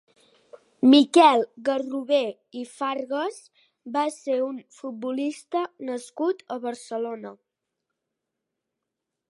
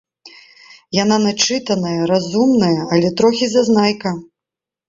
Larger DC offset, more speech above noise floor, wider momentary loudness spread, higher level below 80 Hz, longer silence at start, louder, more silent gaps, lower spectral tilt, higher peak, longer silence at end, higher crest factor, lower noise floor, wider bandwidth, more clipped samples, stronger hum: neither; second, 60 dB vs 71 dB; first, 17 LU vs 7 LU; second, -84 dBFS vs -56 dBFS; first, 0.8 s vs 0.25 s; second, -24 LUFS vs -16 LUFS; neither; about the same, -3.5 dB/octave vs -4.5 dB/octave; second, -4 dBFS vs 0 dBFS; first, 1.95 s vs 0.65 s; first, 22 dB vs 16 dB; about the same, -84 dBFS vs -86 dBFS; first, 11.5 kHz vs 7.8 kHz; neither; neither